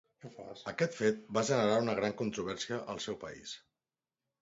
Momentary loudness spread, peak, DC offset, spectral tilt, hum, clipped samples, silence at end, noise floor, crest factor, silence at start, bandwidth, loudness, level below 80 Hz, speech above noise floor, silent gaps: 18 LU; -16 dBFS; under 0.1%; -4 dB/octave; none; under 0.1%; 0.85 s; under -90 dBFS; 20 dB; 0.25 s; 7.6 kHz; -34 LUFS; -70 dBFS; over 56 dB; none